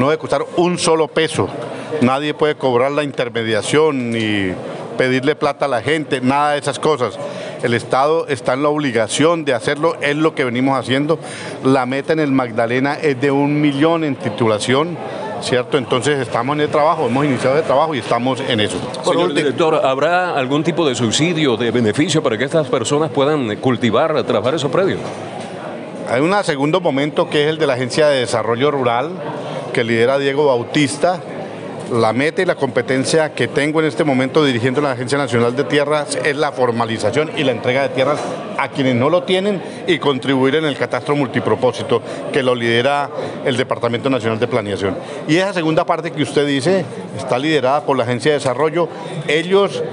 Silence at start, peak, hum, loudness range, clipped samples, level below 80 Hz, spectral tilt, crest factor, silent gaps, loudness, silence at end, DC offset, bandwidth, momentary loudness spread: 0 s; -2 dBFS; none; 2 LU; under 0.1%; -60 dBFS; -5 dB/octave; 14 dB; none; -17 LUFS; 0 s; under 0.1%; 11 kHz; 6 LU